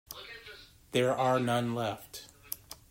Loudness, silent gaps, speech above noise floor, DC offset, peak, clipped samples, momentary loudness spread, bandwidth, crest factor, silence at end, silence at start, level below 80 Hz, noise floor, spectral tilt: -31 LUFS; none; 23 dB; under 0.1%; -12 dBFS; under 0.1%; 19 LU; 16 kHz; 22 dB; 0.15 s; 0.1 s; -64 dBFS; -52 dBFS; -5 dB/octave